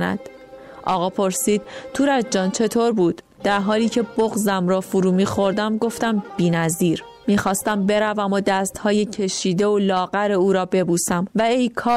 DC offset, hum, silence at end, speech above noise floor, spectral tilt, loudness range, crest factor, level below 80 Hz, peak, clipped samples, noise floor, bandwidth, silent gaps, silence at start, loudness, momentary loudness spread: under 0.1%; none; 0 s; 21 dB; -5 dB/octave; 1 LU; 12 dB; -54 dBFS; -8 dBFS; under 0.1%; -40 dBFS; 16 kHz; none; 0 s; -20 LUFS; 4 LU